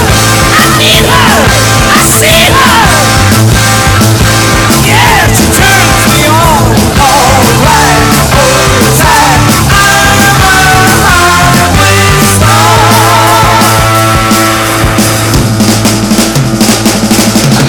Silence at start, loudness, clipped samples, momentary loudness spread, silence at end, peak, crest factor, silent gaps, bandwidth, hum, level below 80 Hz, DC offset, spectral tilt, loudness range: 0 s; -4 LUFS; 0.5%; 3 LU; 0 s; 0 dBFS; 4 dB; none; over 20 kHz; none; -18 dBFS; under 0.1%; -3.5 dB/octave; 2 LU